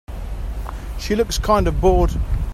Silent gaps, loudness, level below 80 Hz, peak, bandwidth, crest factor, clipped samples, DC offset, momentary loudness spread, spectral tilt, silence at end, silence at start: none; -20 LUFS; -24 dBFS; -2 dBFS; 14.5 kHz; 16 dB; under 0.1%; under 0.1%; 14 LU; -6 dB/octave; 0 s; 0.1 s